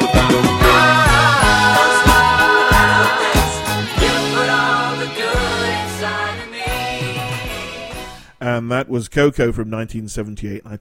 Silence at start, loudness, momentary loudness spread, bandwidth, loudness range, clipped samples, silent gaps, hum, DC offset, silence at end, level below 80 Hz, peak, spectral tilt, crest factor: 0 s; -15 LUFS; 16 LU; 16.5 kHz; 11 LU; under 0.1%; none; none; under 0.1%; 0.05 s; -28 dBFS; 0 dBFS; -4 dB/octave; 16 dB